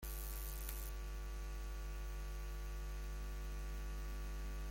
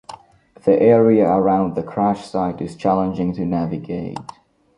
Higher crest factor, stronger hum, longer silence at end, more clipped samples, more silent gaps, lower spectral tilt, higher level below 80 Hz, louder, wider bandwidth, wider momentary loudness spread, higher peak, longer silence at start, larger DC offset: about the same, 18 dB vs 16 dB; first, 50 Hz at -45 dBFS vs none; second, 0 s vs 0.45 s; neither; neither; second, -4.5 dB/octave vs -8.5 dB/octave; first, -44 dBFS vs -50 dBFS; second, -48 LUFS vs -18 LUFS; first, 17 kHz vs 10.5 kHz; second, 2 LU vs 13 LU; second, -26 dBFS vs -2 dBFS; about the same, 0 s vs 0.1 s; neither